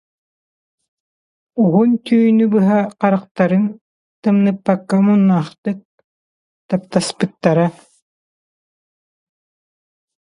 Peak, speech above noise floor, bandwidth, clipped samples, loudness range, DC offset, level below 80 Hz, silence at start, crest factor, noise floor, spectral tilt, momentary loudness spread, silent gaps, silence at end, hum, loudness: 0 dBFS; over 75 dB; 11 kHz; under 0.1%; 6 LU; under 0.1%; -64 dBFS; 1.55 s; 18 dB; under -90 dBFS; -7.5 dB/octave; 10 LU; 3.31-3.35 s, 3.81-4.23 s, 5.58-5.63 s, 5.85-5.98 s, 6.04-6.69 s; 2.65 s; none; -16 LUFS